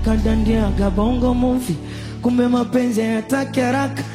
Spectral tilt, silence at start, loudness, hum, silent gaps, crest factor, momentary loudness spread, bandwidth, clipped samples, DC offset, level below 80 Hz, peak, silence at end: -6.5 dB/octave; 0 s; -19 LUFS; none; none; 14 dB; 5 LU; 15 kHz; under 0.1%; under 0.1%; -26 dBFS; -4 dBFS; 0 s